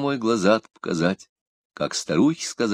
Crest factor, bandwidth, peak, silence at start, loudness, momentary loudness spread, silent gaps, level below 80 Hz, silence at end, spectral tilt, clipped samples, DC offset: 18 dB; 14.5 kHz; -4 dBFS; 0 s; -23 LUFS; 9 LU; 1.29-1.70 s; -62 dBFS; 0 s; -5 dB/octave; under 0.1%; under 0.1%